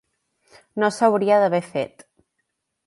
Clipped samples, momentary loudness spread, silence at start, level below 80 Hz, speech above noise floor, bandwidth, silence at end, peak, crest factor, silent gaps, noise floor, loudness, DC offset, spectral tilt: under 0.1%; 14 LU; 0.75 s; -72 dBFS; 57 dB; 11.5 kHz; 1 s; -4 dBFS; 20 dB; none; -76 dBFS; -20 LUFS; under 0.1%; -5.5 dB/octave